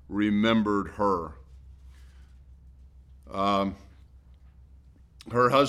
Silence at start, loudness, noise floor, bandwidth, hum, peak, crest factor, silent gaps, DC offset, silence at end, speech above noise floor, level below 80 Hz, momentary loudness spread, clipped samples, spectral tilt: 0.1 s; -26 LUFS; -54 dBFS; 12.5 kHz; none; -10 dBFS; 20 dB; none; under 0.1%; 0 s; 29 dB; -50 dBFS; 17 LU; under 0.1%; -6.5 dB/octave